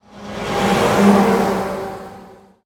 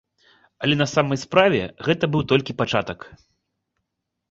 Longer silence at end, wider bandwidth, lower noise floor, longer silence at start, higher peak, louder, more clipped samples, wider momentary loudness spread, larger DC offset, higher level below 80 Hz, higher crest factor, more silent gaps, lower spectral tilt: second, 0.35 s vs 1.15 s; first, 18.5 kHz vs 8 kHz; second, -42 dBFS vs -80 dBFS; second, 0.15 s vs 0.6 s; about the same, -2 dBFS vs -2 dBFS; first, -16 LUFS vs -21 LUFS; neither; first, 19 LU vs 8 LU; neither; first, -44 dBFS vs -52 dBFS; about the same, 16 dB vs 20 dB; neither; about the same, -5.5 dB/octave vs -5.5 dB/octave